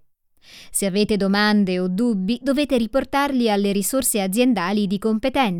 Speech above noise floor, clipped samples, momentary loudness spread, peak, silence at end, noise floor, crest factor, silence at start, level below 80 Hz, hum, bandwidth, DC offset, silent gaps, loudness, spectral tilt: 35 dB; under 0.1%; 4 LU; -6 dBFS; 0 s; -55 dBFS; 14 dB; 0.55 s; -48 dBFS; none; 18 kHz; under 0.1%; none; -20 LUFS; -4.5 dB/octave